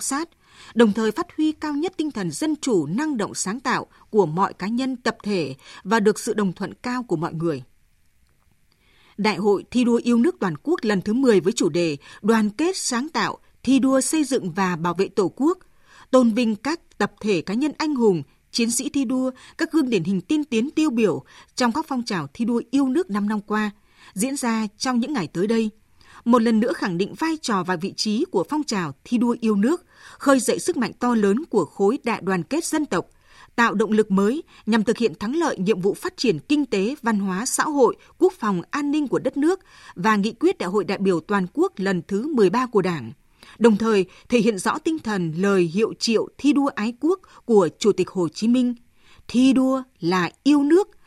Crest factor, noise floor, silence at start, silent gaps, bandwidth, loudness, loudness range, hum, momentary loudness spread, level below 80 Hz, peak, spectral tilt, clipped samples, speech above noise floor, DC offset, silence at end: 20 dB; -60 dBFS; 0 s; none; 13.5 kHz; -22 LUFS; 3 LU; none; 7 LU; -60 dBFS; -2 dBFS; -5 dB/octave; under 0.1%; 39 dB; under 0.1%; 0.2 s